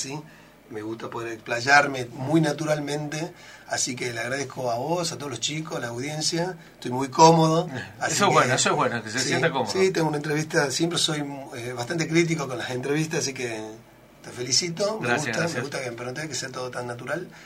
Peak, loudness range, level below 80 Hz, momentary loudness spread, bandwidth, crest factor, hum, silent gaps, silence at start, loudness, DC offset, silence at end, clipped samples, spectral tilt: -2 dBFS; 6 LU; -62 dBFS; 14 LU; 16 kHz; 24 dB; none; none; 0 s; -24 LUFS; under 0.1%; 0 s; under 0.1%; -4 dB/octave